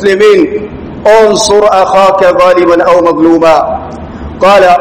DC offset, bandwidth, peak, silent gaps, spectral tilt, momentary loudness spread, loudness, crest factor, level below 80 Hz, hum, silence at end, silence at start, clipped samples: under 0.1%; 15 kHz; 0 dBFS; none; -4 dB/octave; 13 LU; -6 LUFS; 6 dB; -34 dBFS; none; 0 s; 0 s; 10%